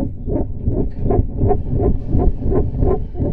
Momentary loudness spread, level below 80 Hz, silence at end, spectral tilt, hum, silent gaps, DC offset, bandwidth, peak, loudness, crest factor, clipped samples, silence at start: 4 LU; -20 dBFS; 0 s; -13.5 dB/octave; none; none; under 0.1%; 2.5 kHz; -2 dBFS; -20 LUFS; 14 dB; under 0.1%; 0 s